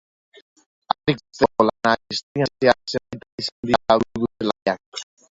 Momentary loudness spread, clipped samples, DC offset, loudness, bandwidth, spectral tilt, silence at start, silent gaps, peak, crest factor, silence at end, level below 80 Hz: 11 LU; under 0.1%; under 0.1%; -22 LUFS; 8 kHz; -5 dB/octave; 1.05 s; 2.23-2.35 s, 3.32-3.38 s, 3.52-3.63 s, 4.62-4.66 s, 4.86-4.92 s; 0 dBFS; 22 dB; 0.35 s; -54 dBFS